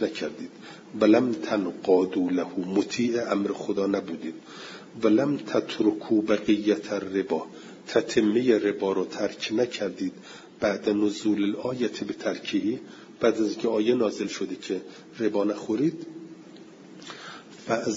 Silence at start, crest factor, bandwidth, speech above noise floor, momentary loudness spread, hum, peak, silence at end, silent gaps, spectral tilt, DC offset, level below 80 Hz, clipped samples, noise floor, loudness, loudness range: 0 s; 20 dB; 7.8 kHz; 21 dB; 18 LU; none; -8 dBFS; 0 s; none; -5.5 dB/octave; under 0.1%; -68 dBFS; under 0.1%; -47 dBFS; -26 LUFS; 3 LU